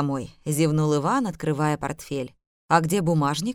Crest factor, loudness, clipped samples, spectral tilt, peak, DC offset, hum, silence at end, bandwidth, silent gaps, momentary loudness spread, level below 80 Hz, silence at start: 20 dB; -24 LUFS; under 0.1%; -6 dB/octave; -4 dBFS; under 0.1%; none; 0 s; 16 kHz; 2.47-2.69 s; 10 LU; -54 dBFS; 0 s